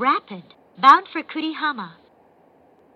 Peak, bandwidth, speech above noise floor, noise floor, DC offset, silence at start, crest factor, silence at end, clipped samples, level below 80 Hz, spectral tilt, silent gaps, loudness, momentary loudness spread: 0 dBFS; 8 kHz; 36 dB; -55 dBFS; under 0.1%; 0 s; 22 dB; 1.05 s; under 0.1%; -78 dBFS; -4.5 dB/octave; none; -19 LUFS; 25 LU